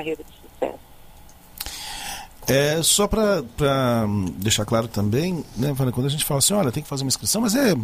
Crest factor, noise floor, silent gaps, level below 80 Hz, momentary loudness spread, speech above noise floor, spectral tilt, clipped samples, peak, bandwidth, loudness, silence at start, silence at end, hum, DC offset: 16 dB; -45 dBFS; none; -44 dBFS; 13 LU; 24 dB; -4 dB/octave; under 0.1%; -6 dBFS; 15.5 kHz; -22 LUFS; 0 s; 0 s; none; under 0.1%